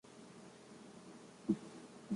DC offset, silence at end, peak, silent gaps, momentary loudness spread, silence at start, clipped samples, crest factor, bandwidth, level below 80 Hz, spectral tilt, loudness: under 0.1%; 0 s; -22 dBFS; none; 16 LU; 0.05 s; under 0.1%; 24 dB; 11.5 kHz; -78 dBFS; -6.5 dB/octave; -46 LUFS